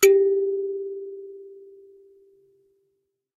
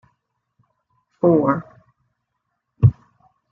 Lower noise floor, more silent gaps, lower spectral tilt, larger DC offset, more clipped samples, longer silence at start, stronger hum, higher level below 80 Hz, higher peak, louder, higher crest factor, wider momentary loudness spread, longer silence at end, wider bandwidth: about the same, -75 dBFS vs -76 dBFS; neither; second, -1.5 dB/octave vs -13 dB/octave; neither; neither; second, 0 s vs 1.25 s; neither; second, -76 dBFS vs -46 dBFS; about the same, -4 dBFS vs -2 dBFS; second, -23 LUFS vs -19 LUFS; about the same, 22 dB vs 20 dB; first, 26 LU vs 5 LU; first, 1.8 s vs 0.6 s; first, 15.5 kHz vs 2.9 kHz